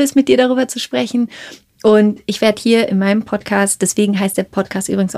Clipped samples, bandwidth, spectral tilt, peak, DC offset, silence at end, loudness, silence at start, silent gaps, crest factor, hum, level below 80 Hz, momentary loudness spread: under 0.1%; 15 kHz; -4.5 dB/octave; -2 dBFS; under 0.1%; 0 s; -15 LUFS; 0 s; none; 14 dB; none; -54 dBFS; 8 LU